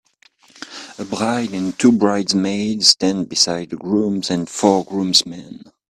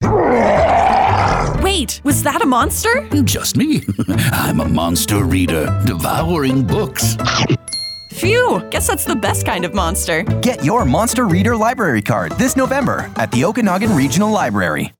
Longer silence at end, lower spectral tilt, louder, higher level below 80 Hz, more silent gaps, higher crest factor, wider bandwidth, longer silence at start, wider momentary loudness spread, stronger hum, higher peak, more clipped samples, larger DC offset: first, 0.35 s vs 0.1 s; about the same, -3.5 dB/octave vs -4.5 dB/octave; about the same, -17 LUFS vs -15 LUFS; second, -58 dBFS vs -32 dBFS; neither; first, 18 dB vs 12 dB; second, 16 kHz vs 19.5 kHz; first, 0.6 s vs 0 s; first, 18 LU vs 5 LU; neither; first, 0 dBFS vs -4 dBFS; neither; neither